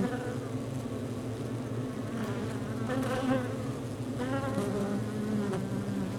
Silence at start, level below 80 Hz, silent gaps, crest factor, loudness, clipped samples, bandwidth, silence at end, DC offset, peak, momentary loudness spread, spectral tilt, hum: 0 s; -56 dBFS; none; 18 dB; -34 LUFS; under 0.1%; 17.5 kHz; 0 s; under 0.1%; -14 dBFS; 5 LU; -7 dB/octave; none